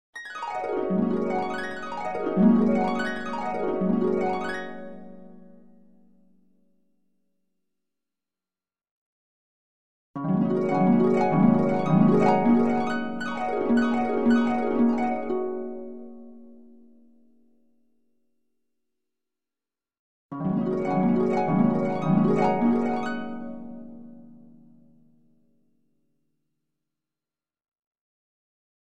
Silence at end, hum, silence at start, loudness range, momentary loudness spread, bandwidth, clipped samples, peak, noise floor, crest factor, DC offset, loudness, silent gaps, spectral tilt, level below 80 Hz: 0.95 s; none; 0.1 s; 15 LU; 18 LU; 8.2 kHz; under 0.1%; -6 dBFS; under -90 dBFS; 20 dB; under 0.1%; -24 LUFS; 8.91-10.14 s, 19.99-20.29 s, 27.68-27.72 s, 27.79-27.91 s; -8.5 dB/octave; -58 dBFS